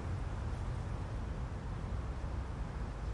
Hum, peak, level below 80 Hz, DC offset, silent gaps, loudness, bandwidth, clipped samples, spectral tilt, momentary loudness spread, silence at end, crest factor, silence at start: none; -28 dBFS; -42 dBFS; under 0.1%; none; -42 LUFS; 11 kHz; under 0.1%; -7 dB/octave; 2 LU; 0 s; 12 dB; 0 s